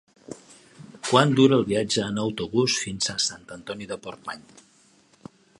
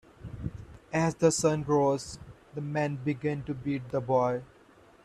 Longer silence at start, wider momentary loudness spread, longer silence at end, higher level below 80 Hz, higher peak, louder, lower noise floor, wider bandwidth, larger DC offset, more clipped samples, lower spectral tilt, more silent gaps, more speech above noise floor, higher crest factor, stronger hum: about the same, 0.3 s vs 0.2 s; first, 22 LU vs 17 LU; first, 1.2 s vs 0.6 s; about the same, -60 dBFS vs -56 dBFS; first, 0 dBFS vs -10 dBFS; first, -23 LUFS vs -29 LUFS; about the same, -59 dBFS vs -57 dBFS; second, 11.5 kHz vs 13.5 kHz; neither; neither; about the same, -4.5 dB/octave vs -5.5 dB/octave; neither; first, 35 dB vs 29 dB; about the same, 24 dB vs 20 dB; neither